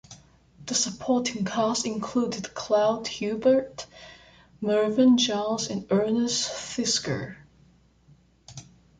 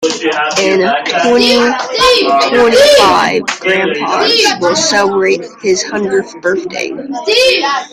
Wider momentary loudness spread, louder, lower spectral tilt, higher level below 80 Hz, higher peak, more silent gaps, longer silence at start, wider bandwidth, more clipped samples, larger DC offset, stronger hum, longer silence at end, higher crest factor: first, 19 LU vs 9 LU; second, -25 LUFS vs -10 LUFS; about the same, -3.5 dB/octave vs -2.5 dB/octave; second, -60 dBFS vs -46 dBFS; second, -10 dBFS vs 0 dBFS; neither; about the same, 0.1 s vs 0 s; second, 9.6 kHz vs 16 kHz; neither; neither; neither; first, 0.35 s vs 0.05 s; first, 16 dB vs 10 dB